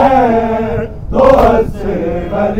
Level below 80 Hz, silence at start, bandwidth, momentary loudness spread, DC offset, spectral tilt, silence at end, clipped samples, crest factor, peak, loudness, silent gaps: -24 dBFS; 0 s; 15.5 kHz; 10 LU; under 0.1%; -8 dB/octave; 0 s; 0.2%; 12 dB; 0 dBFS; -12 LUFS; none